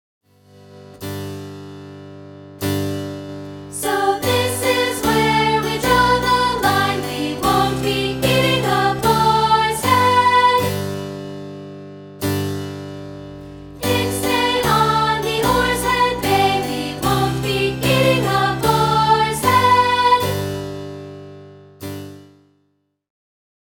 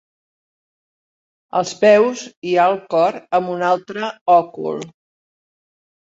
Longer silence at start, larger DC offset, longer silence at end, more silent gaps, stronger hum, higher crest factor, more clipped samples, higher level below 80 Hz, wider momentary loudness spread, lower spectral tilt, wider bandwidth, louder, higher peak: second, 0.7 s vs 1.55 s; neither; first, 1.45 s vs 1.25 s; second, none vs 2.37-2.42 s, 4.21-4.26 s; first, 50 Hz at -50 dBFS vs none; about the same, 16 dB vs 18 dB; neither; first, -40 dBFS vs -70 dBFS; first, 20 LU vs 13 LU; about the same, -4.5 dB/octave vs -4.5 dB/octave; first, 19 kHz vs 8 kHz; about the same, -17 LUFS vs -17 LUFS; about the same, -2 dBFS vs -2 dBFS